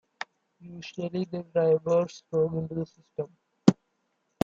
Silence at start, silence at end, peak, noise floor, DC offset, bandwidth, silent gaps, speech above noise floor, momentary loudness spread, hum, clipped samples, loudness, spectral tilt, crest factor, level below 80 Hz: 0.65 s; 0.7 s; -2 dBFS; -76 dBFS; under 0.1%; 7.8 kHz; none; 47 dB; 17 LU; none; under 0.1%; -28 LUFS; -7.5 dB/octave; 26 dB; -68 dBFS